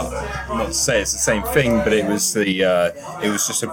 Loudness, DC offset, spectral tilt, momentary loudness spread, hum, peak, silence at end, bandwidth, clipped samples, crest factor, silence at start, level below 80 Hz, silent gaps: -19 LUFS; under 0.1%; -3 dB/octave; 7 LU; none; -2 dBFS; 0 s; 17 kHz; under 0.1%; 16 dB; 0 s; -38 dBFS; none